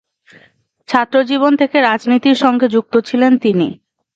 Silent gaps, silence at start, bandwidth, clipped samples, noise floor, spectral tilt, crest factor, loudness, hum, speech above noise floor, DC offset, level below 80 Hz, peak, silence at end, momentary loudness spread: none; 0.9 s; 7.8 kHz; under 0.1%; -52 dBFS; -6 dB/octave; 14 dB; -13 LUFS; none; 40 dB; under 0.1%; -62 dBFS; 0 dBFS; 0.45 s; 5 LU